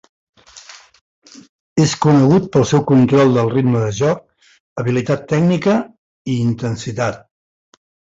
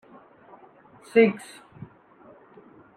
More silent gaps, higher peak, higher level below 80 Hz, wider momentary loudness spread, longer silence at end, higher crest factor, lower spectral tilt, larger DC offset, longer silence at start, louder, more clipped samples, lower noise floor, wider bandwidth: first, 1.01-1.22 s, 1.49-1.76 s, 4.60-4.76 s, 5.98-6.25 s vs none; first, -2 dBFS vs -6 dBFS; first, -50 dBFS vs -74 dBFS; second, 15 LU vs 27 LU; second, 1 s vs 1.6 s; second, 16 dB vs 22 dB; about the same, -7 dB/octave vs -6.5 dB/octave; neither; second, 0.55 s vs 1.15 s; first, -16 LUFS vs -22 LUFS; neither; second, -41 dBFS vs -53 dBFS; second, 8 kHz vs 10.5 kHz